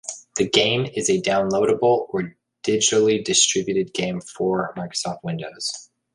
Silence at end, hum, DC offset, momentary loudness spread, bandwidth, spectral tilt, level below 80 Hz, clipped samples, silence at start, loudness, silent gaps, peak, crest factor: 0.3 s; none; under 0.1%; 12 LU; 11.5 kHz; -3 dB/octave; -58 dBFS; under 0.1%; 0.05 s; -21 LUFS; none; 0 dBFS; 20 dB